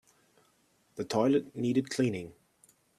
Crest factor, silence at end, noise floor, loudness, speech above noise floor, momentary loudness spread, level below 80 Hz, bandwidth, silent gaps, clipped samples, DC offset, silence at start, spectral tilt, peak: 18 dB; 0.7 s; -70 dBFS; -31 LUFS; 40 dB; 17 LU; -72 dBFS; 13.5 kHz; none; under 0.1%; under 0.1%; 0.95 s; -6 dB/octave; -14 dBFS